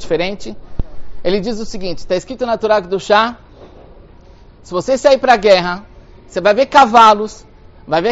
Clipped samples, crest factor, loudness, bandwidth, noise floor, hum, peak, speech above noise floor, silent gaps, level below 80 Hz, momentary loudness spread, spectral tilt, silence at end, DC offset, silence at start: 0.1%; 14 dB; -13 LUFS; 8.2 kHz; -41 dBFS; none; 0 dBFS; 28 dB; none; -36 dBFS; 18 LU; -4.5 dB/octave; 0 s; under 0.1%; 0 s